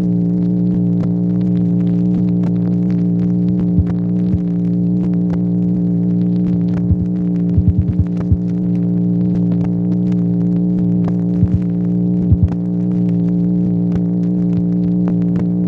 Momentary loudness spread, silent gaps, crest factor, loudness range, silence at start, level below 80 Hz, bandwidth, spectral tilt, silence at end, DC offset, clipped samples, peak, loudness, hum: 2 LU; none; 14 dB; 1 LU; 0 s; -32 dBFS; 2.4 kHz; -12 dB/octave; 0 s; under 0.1%; under 0.1%; 0 dBFS; -16 LUFS; none